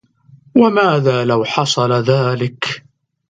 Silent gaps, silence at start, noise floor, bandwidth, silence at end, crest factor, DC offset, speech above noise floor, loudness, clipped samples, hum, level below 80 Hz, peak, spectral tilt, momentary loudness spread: none; 0.55 s; -47 dBFS; 9.4 kHz; 0.5 s; 16 dB; under 0.1%; 33 dB; -15 LUFS; under 0.1%; none; -58 dBFS; 0 dBFS; -5.5 dB/octave; 9 LU